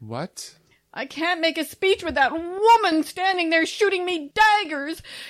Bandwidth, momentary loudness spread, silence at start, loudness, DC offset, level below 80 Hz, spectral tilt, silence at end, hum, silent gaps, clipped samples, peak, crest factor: 16 kHz; 16 LU; 0 s; -21 LUFS; under 0.1%; -56 dBFS; -3 dB/octave; 0 s; none; none; under 0.1%; -6 dBFS; 16 dB